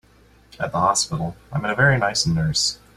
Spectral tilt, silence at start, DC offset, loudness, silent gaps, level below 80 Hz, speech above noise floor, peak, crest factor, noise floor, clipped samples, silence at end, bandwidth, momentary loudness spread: -3.5 dB/octave; 0.6 s; under 0.1%; -20 LUFS; none; -46 dBFS; 32 dB; -2 dBFS; 20 dB; -53 dBFS; under 0.1%; 0.2 s; 14 kHz; 10 LU